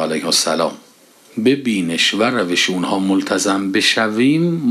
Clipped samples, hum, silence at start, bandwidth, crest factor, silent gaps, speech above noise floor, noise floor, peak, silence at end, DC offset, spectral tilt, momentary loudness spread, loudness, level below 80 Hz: under 0.1%; none; 0 s; 14 kHz; 14 dB; none; 31 dB; -48 dBFS; -2 dBFS; 0 s; under 0.1%; -3.5 dB/octave; 4 LU; -16 LUFS; -68 dBFS